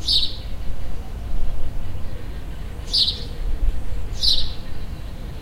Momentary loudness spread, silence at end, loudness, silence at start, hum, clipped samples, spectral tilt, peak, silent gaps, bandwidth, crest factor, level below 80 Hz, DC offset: 16 LU; 0 s; -25 LUFS; 0 s; none; under 0.1%; -3.5 dB/octave; -4 dBFS; none; 12.5 kHz; 14 dB; -26 dBFS; under 0.1%